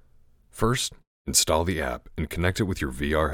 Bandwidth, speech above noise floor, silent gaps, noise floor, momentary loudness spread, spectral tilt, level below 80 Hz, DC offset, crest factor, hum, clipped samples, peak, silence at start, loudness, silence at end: 18 kHz; 31 dB; 1.07-1.25 s; -56 dBFS; 11 LU; -3.5 dB/octave; -40 dBFS; under 0.1%; 22 dB; none; under 0.1%; -6 dBFS; 0.55 s; -26 LUFS; 0 s